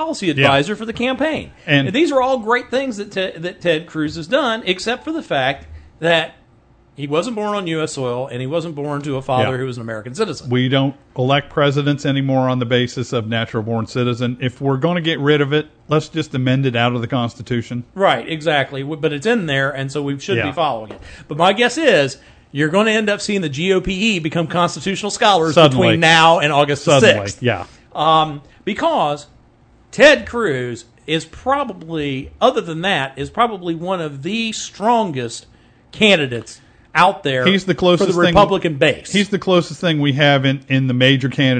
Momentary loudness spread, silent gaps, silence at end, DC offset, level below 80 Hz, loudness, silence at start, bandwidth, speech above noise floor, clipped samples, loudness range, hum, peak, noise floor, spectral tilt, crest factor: 11 LU; none; 0 s; under 0.1%; -46 dBFS; -17 LUFS; 0 s; 9.4 kHz; 34 dB; under 0.1%; 7 LU; none; 0 dBFS; -51 dBFS; -5 dB/octave; 18 dB